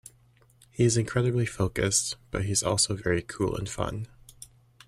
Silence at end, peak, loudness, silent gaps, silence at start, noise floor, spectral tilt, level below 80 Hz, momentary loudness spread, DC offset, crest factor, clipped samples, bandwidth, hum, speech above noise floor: 0.4 s; -10 dBFS; -27 LUFS; none; 0.75 s; -61 dBFS; -4 dB/octave; -50 dBFS; 16 LU; under 0.1%; 20 dB; under 0.1%; 13.5 kHz; none; 34 dB